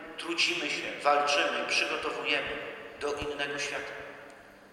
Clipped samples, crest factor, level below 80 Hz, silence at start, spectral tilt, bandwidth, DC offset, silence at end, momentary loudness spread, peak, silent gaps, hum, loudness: under 0.1%; 20 dB; -62 dBFS; 0 s; -1.5 dB/octave; 16 kHz; under 0.1%; 0 s; 15 LU; -12 dBFS; none; none; -29 LUFS